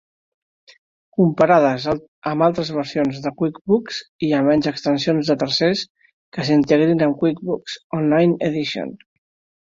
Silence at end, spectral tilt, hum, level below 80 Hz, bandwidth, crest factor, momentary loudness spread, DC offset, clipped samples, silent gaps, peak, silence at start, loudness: 0.65 s; -6.5 dB/octave; none; -56 dBFS; 7.6 kHz; 18 dB; 11 LU; under 0.1%; under 0.1%; 2.08-2.22 s, 3.61-3.65 s, 4.09-4.19 s, 5.90-5.95 s, 6.13-6.32 s, 7.84-7.90 s; -2 dBFS; 1.2 s; -19 LUFS